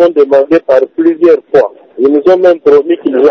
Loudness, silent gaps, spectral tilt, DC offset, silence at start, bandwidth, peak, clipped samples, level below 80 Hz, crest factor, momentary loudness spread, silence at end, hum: -8 LUFS; none; -7 dB/octave; under 0.1%; 0 s; 6.4 kHz; 0 dBFS; 3%; -52 dBFS; 8 dB; 4 LU; 0 s; none